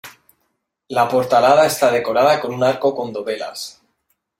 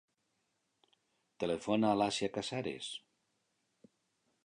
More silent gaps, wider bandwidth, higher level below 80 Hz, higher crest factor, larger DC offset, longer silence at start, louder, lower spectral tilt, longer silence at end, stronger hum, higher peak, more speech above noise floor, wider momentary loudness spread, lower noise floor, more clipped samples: neither; first, 16.5 kHz vs 11 kHz; first, -60 dBFS vs -72 dBFS; second, 16 dB vs 22 dB; neither; second, 0.05 s vs 1.4 s; first, -17 LUFS vs -35 LUFS; about the same, -4 dB/octave vs -4.5 dB/octave; second, 0.7 s vs 1.45 s; neither; first, -2 dBFS vs -18 dBFS; first, 54 dB vs 47 dB; about the same, 13 LU vs 12 LU; second, -71 dBFS vs -81 dBFS; neither